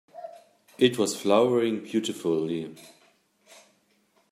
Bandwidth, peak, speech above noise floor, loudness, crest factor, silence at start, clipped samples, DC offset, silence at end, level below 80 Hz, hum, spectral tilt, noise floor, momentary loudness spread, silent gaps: 15.5 kHz; -8 dBFS; 42 dB; -25 LUFS; 20 dB; 0.15 s; under 0.1%; under 0.1%; 1.45 s; -72 dBFS; none; -4.5 dB/octave; -67 dBFS; 21 LU; none